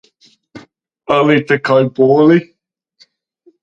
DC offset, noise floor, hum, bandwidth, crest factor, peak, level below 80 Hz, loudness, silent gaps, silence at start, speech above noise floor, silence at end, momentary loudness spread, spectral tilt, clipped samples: under 0.1%; -53 dBFS; none; 7.6 kHz; 14 dB; 0 dBFS; -60 dBFS; -12 LUFS; none; 0.55 s; 42 dB; 1.2 s; 6 LU; -7.5 dB/octave; under 0.1%